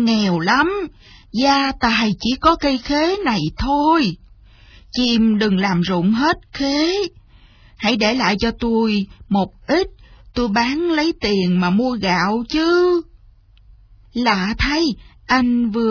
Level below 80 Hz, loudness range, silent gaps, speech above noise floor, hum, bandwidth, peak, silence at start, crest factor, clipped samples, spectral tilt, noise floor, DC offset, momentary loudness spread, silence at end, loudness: -38 dBFS; 2 LU; none; 31 dB; none; 5.4 kHz; -2 dBFS; 0 s; 16 dB; under 0.1%; -5.5 dB/octave; -48 dBFS; under 0.1%; 7 LU; 0 s; -18 LUFS